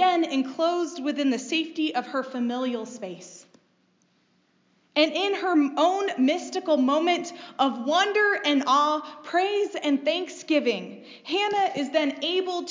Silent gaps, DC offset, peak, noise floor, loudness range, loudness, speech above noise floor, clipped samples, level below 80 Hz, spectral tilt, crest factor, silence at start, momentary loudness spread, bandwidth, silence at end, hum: none; under 0.1%; -8 dBFS; -66 dBFS; 7 LU; -25 LUFS; 41 dB; under 0.1%; -90 dBFS; -3 dB/octave; 18 dB; 0 s; 9 LU; 7.6 kHz; 0 s; none